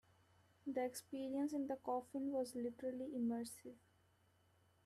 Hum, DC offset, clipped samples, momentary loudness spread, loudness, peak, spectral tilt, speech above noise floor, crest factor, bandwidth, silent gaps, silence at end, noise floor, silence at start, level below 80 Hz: none; under 0.1%; under 0.1%; 8 LU; -44 LUFS; -30 dBFS; -5 dB/octave; 32 dB; 16 dB; 14.5 kHz; none; 1.1 s; -76 dBFS; 0.65 s; -84 dBFS